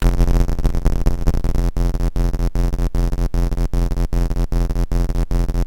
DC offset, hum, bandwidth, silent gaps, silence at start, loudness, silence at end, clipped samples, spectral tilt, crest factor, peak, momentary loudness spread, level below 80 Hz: under 0.1%; none; 16.5 kHz; none; 0 s; -22 LUFS; 0 s; under 0.1%; -7 dB/octave; 14 dB; -2 dBFS; 2 LU; -18 dBFS